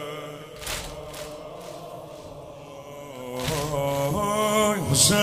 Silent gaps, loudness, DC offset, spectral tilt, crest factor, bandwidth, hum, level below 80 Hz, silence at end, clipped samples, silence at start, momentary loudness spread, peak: none; -25 LUFS; under 0.1%; -3.5 dB/octave; 22 dB; 16 kHz; none; -48 dBFS; 0 s; under 0.1%; 0 s; 19 LU; -4 dBFS